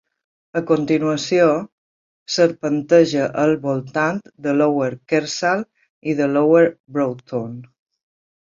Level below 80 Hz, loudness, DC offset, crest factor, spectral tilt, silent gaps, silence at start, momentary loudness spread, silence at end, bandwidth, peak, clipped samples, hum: -64 dBFS; -19 LUFS; under 0.1%; 18 dB; -5.5 dB/octave; 1.72-2.26 s, 5.89-6.01 s, 6.80-6.84 s; 0.55 s; 12 LU; 0.8 s; 7.6 kHz; -2 dBFS; under 0.1%; none